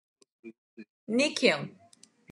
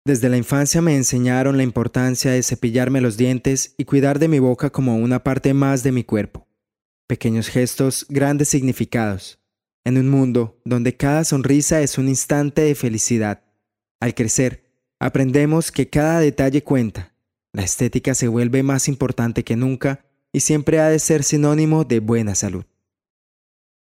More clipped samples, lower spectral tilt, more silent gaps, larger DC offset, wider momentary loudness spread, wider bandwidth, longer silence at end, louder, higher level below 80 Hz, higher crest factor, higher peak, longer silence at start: neither; second, -3.5 dB/octave vs -5.5 dB/octave; about the same, 0.58-0.77 s, 0.90-1.07 s vs 6.85-7.08 s, 9.74-9.83 s, 13.91-13.99 s; neither; first, 25 LU vs 7 LU; second, 12 kHz vs 16 kHz; second, 0.6 s vs 1.3 s; second, -27 LUFS vs -18 LUFS; second, under -90 dBFS vs -46 dBFS; first, 24 dB vs 16 dB; second, -8 dBFS vs -2 dBFS; first, 0.45 s vs 0.05 s